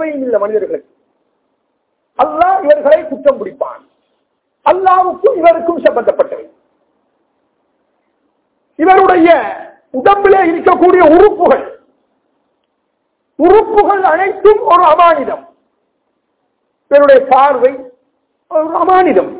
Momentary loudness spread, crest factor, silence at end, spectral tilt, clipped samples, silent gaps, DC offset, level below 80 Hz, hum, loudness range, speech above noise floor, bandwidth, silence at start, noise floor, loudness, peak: 15 LU; 12 dB; 0 s; -8.5 dB/octave; 2%; none; under 0.1%; -46 dBFS; none; 5 LU; 57 dB; 4 kHz; 0 s; -65 dBFS; -9 LUFS; 0 dBFS